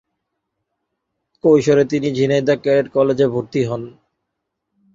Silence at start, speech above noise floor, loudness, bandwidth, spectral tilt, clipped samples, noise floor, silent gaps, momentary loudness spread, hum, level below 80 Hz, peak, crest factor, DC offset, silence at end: 1.45 s; 61 dB; -17 LUFS; 7.6 kHz; -7 dB/octave; under 0.1%; -77 dBFS; none; 8 LU; none; -58 dBFS; -2 dBFS; 16 dB; under 0.1%; 1.05 s